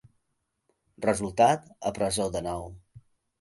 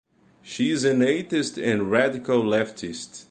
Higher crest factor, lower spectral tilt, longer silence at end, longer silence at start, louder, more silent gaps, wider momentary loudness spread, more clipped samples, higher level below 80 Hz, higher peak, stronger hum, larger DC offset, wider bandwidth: about the same, 20 dB vs 18 dB; about the same, -4.5 dB/octave vs -5 dB/octave; first, 0.4 s vs 0.1 s; first, 1 s vs 0.45 s; second, -27 LUFS vs -23 LUFS; neither; about the same, 12 LU vs 13 LU; neither; first, -54 dBFS vs -62 dBFS; about the same, -8 dBFS vs -6 dBFS; neither; neither; first, 12 kHz vs 9.8 kHz